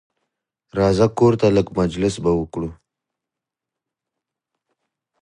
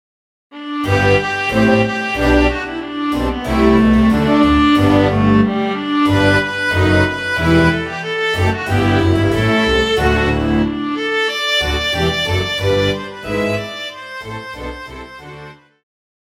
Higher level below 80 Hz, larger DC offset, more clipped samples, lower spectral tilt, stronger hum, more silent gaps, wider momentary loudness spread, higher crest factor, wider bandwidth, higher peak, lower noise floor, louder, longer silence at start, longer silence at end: second, -44 dBFS vs -30 dBFS; neither; neither; about the same, -7 dB/octave vs -6 dB/octave; neither; neither; about the same, 14 LU vs 15 LU; first, 20 dB vs 14 dB; second, 11 kHz vs 15.5 kHz; about the same, -2 dBFS vs 0 dBFS; first, -86 dBFS vs -37 dBFS; second, -18 LUFS vs -15 LUFS; first, 0.75 s vs 0.5 s; first, 2.5 s vs 0.8 s